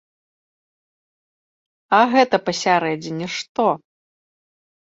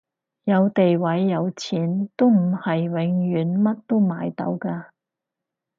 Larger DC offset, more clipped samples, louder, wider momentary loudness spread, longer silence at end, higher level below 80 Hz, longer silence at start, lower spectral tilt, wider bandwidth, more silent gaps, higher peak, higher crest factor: neither; neither; first, -19 LUFS vs -22 LUFS; about the same, 11 LU vs 9 LU; first, 1.1 s vs 0.95 s; about the same, -68 dBFS vs -70 dBFS; first, 1.9 s vs 0.45 s; second, -4.5 dB/octave vs -8 dB/octave; about the same, 7.8 kHz vs 7.4 kHz; first, 3.49-3.55 s vs none; first, -2 dBFS vs -6 dBFS; about the same, 20 dB vs 16 dB